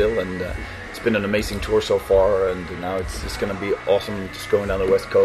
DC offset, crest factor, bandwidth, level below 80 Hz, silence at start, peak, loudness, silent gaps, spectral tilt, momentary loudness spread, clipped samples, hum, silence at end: under 0.1%; 16 dB; 13.5 kHz; -36 dBFS; 0 s; -6 dBFS; -22 LUFS; none; -5.5 dB/octave; 11 LU; under 0.1%; none; 0 s